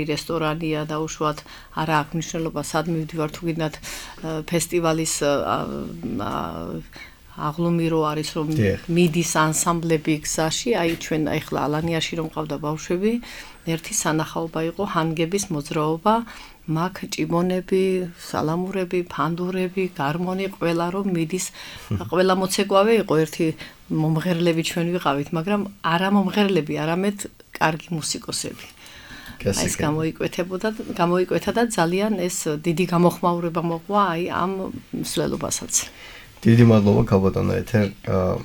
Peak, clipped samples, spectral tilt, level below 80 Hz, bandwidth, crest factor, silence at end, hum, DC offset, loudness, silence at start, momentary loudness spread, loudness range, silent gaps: -2 dBFS; under 0.1%; -5 dB/octave; -46 dBFS; 19 kHz; 20 dB; 0 s; none; under 0.1%; -23 LUFS; 0 s; 11 LU; 4 LU; none